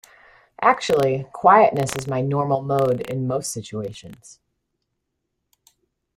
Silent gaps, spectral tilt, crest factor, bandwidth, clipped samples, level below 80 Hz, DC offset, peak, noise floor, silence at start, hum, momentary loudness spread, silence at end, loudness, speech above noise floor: none; -5.5 dB/octave; 20 dB; 16 kHz; under 0.1%; -58 dBFS; under 0.1%; -2 dBFS; -77 dBFS; 0.6 s; none; 15 LU; 2 s; -20 LUFS; 57 dB